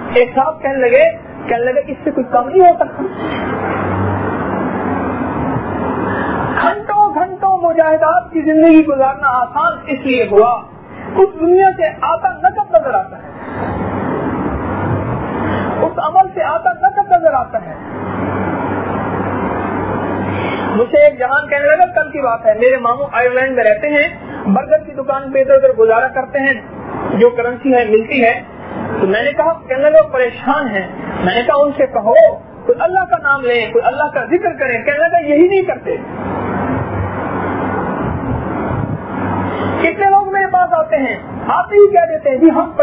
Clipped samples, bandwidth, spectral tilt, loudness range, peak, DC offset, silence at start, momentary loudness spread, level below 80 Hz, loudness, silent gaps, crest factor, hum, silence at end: under 0.1%; 5 kHz; -10.5 dB/octave; 6 LU; 0 dBFS; under 0.1%; 0 s; 10 LU; -40 dBFS; -14 LUFS; none; 14 dB; none; 0 s